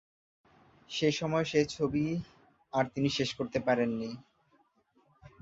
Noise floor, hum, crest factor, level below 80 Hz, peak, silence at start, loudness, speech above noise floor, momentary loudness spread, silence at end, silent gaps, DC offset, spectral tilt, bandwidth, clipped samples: -70 dBFS; none; 20 dB; -62 dBFS; -14 dBFS; 0.9 s; -32 LUFS; 39 dB; 10 LU; 0.15 s; none; under 0.1%; -5.5 dB/octave; 8 kHz; under 0.1%